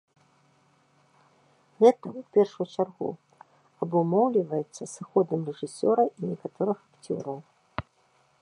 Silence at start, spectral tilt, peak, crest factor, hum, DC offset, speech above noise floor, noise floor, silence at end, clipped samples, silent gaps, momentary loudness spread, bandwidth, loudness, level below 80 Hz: 1.8 s; -7 dB/octave; -6 dBFS; 22 dB; none; under 0.1%; 40 dB; -66 dBFS; 0.6 s; under 0.1%; none; 18 LU; 11 kHz; -27 LUFS; -66 dBFS